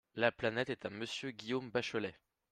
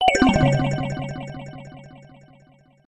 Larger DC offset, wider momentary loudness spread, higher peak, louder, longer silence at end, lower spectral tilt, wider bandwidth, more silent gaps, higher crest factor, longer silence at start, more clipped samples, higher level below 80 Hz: neither; second, 8 LU vs 24 LU; second, -16 dBFS vs -2 dBFS; second, -38 LUFS vs -21 LUFS; second, 0.4 s vs 0.9 s; about the same, -4.5 dB/octave vs -5.5 dB/octave; about the same, 12 kHz vs 11 kHz; neither; about the same, 24 dB vs 20 dB; first, 0.15 s vs 0 s; neither; second, -72 dBFS vs -40 dBFS